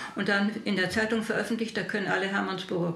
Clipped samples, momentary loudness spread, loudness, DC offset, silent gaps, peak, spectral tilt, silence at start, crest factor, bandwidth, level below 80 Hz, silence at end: under 0.1%; 4 LU; -28 LUFS; under 0.1%; none; -12 dBFS; -5 dB/octave; 0 s; 16 dB; 13.5 kHz; -64 dBFS; 0 s